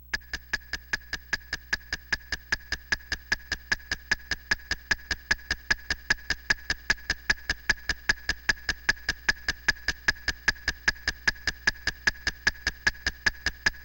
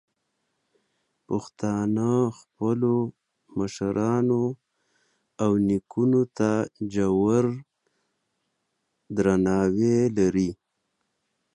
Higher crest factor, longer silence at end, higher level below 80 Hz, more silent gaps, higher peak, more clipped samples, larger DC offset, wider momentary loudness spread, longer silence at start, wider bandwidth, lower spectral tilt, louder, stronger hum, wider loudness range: first, 22 dB vs 16 dB; second, 0 s vs 1 s; first, -42 dBFS vs -56 dBFS; neither; about the same, -8 dBFS vs -8 dBFS; neither; neither; second, 5 LU vs 10 LU; second, 0.1 s vs 1.3 s; first, 16.5 kHz vs 10.5 kHz; second, -1 dB/octave vs -7.5 dB/octave; second, -29 LUFS vs -25 LUFS; neither; about the same, 4 LU vs 3 LU